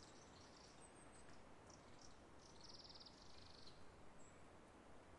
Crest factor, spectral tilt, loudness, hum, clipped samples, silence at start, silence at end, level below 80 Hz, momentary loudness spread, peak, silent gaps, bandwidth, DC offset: 14 dB; -3.5 dB/octave; -63 LUFS; none; under 0.1%; 0 s; 0 s; -76 dBFS; 6 LU; -48 dBFS; none; 11 kHz; under 0.1%